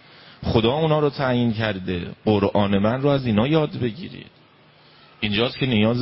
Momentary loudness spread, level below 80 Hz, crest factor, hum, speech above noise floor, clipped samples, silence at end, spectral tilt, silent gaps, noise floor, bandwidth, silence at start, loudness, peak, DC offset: 9 LU; -44 dBFS; 18 dB; none; 32 dB; under 0.1%; 0 s; -11 dB/octave; none; -53 dBFS; 5.8 kHz; 0.4 s; -21 LUFS; -4 dBFS; under 0.1%